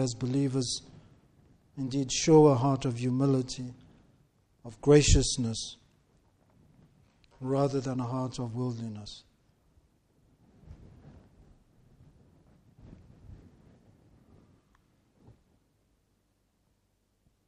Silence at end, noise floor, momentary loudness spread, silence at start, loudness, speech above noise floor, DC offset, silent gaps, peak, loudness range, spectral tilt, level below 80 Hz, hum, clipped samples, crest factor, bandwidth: 4.1 s; -74 dBFS; 22 LU; 0 s; -28 LUFS; 47 dB; under 0.1%; none; -8 dBFS; 12 LU; -5.5 dB/octave; -44 dBFS; none; under 0.1%; 24 dB; 10.5 kHz